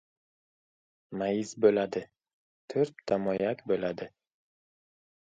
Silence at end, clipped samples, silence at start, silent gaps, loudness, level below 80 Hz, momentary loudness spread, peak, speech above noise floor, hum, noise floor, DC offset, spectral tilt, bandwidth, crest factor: 1.15 s; under 0.1%; 1.1 s; 2.34-2.68 s; -30 LUFS; -70 dBFS; 13 LU; -10 dBFS; over 61 dB; none; under -90 dBFS; under 0.1%; -6 dB/octave; 9 kHz; 22 dB